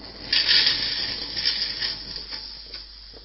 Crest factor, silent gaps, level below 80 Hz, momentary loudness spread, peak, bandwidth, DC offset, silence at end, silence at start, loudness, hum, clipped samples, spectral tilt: 20 dB; none; -48 dBFS; 20 LU; -6 dBFS; 6 kHz; under 0.1%; 0 s; 0 s; -21 LUFS; none; under 0.1%; -3.5 dB/octave